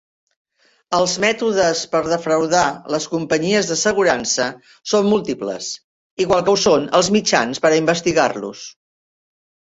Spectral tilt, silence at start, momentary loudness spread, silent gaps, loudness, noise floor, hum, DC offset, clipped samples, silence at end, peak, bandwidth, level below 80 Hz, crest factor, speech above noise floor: -3.5 dB/octave; 0.9 s; 12 LU; 5.84-6.17 s; -17 LUFS; under -90 dBFS; none; under 0.1%; under 0.1%; 1 s; -2 dBFS; 8.2 kHz; -54 dBFS; 18 dB; over 72 dB